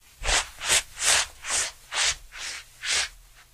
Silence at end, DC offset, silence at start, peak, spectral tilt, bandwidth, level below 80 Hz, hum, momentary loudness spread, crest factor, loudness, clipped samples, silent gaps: 0.35 s; under 0.1%; 0.2 s; -4 dBFS; 1.5 dB/octave; 15.5 kHz; -44 dBFS; none; 12 LU; 24 dB; -25 LUFS; under 0.1%; none